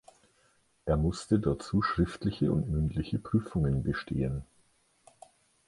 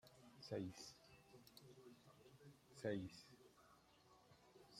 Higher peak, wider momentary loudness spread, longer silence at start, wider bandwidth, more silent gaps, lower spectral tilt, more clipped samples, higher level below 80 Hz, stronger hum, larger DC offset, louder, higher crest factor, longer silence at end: first, -12 dBFS vs -34 dBFS; second, 5 LU vs 19 LU; first, 0.85 s vs 0.05 s; second, 11.5 kHz vs 16 kHz; neither; first, -7.5 dB/octave vs -5.5 dB/octave; neither; first, -44 dBFS vs -84 dBFS; neither; neither; first, -31 LUFS vs -53 LUFS; about the same, 18 dB vs 22 dB; first, 1.25 s vs 0 s